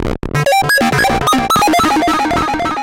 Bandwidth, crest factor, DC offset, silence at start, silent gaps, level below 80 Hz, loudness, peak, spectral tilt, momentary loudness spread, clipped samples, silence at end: 17 kHz; 8 dB; under 0.1%; 0 s; none; -32 dBFS; -12 LUFS; -6 dBFS; -4 dB/octave; 5 LU; under 0.1%; 0 s